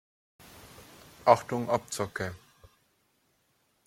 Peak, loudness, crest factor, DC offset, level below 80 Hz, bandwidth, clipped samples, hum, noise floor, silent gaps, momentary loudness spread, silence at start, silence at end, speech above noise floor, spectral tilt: -6 dBFS; -29 LUFS; 26 dB; under 0.1%; -66 dBFS; 16.5 kHz; under 0.1%; none; -72 dBFS; none; 26 LU; 0.65 s; 1.5 s; 44 dB; -5 dB/octave